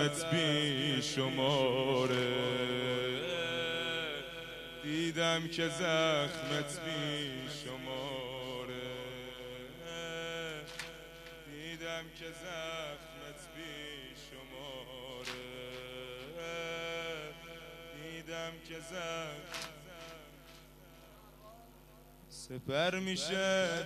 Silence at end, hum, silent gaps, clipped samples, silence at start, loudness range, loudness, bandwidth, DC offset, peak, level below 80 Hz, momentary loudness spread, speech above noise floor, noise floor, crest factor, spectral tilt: 0 s; 50 Hz at -60 dBFS; none; under 0.1%; 0 s; 12 LU; -37 LUFS; 15 kHz; under 0.1%; -16 dBFS; -62 dBFS; 18 LU; 23 dB; -58 dBFS; 20 dB; -4 dB/octave